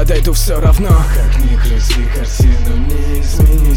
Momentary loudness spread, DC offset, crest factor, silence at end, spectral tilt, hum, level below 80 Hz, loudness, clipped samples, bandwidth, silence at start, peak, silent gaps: 6 LU; under 0.1%; 10 dB; 0 s; -5.5 dB/octave; none; -10 dBFS; -14 LUFS; under 0.1%; 17 kHz; 0 s; 0 dBFS; none